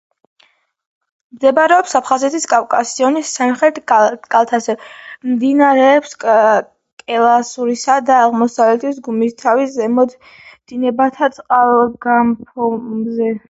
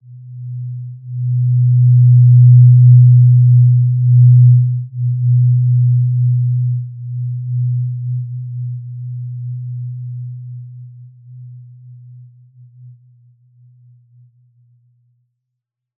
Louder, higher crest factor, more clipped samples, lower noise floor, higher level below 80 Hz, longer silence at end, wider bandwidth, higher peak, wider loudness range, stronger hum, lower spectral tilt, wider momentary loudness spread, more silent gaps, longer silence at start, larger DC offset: second, -14 LUFS vs -11 LUFS; about the same, 14 dB vs 12 dB; neither; second, -56 dBFS vs -79 dBFS; about the same, -62 dBFS vs -62 dBFS; second, 0.1 s vs 4.1 s; first, 8.2 kHz vs 0.2 kHz; about the same, 0 dBFS vs -2 dBFS; second, 3 LU vs 20 LU; neither; second, -4 dB/octave vs -20.5 dB/octave; second, 9 LU vs 20 LU; first, 6.92-6.97 s vs none; first, 1.35 s vs 0.1 s; neither